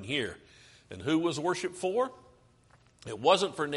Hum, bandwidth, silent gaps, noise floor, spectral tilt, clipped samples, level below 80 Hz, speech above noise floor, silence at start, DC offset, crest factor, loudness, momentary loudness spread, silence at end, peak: none; 11.5 kHz; none; -63 dBFS; -4.5 dB/octave; under 0.1%; -66 dBFS; 33 dB; 0 s; under 0.1%; 22 dB; -30 LUFS; 20 LU; 0 s; -10 dBFS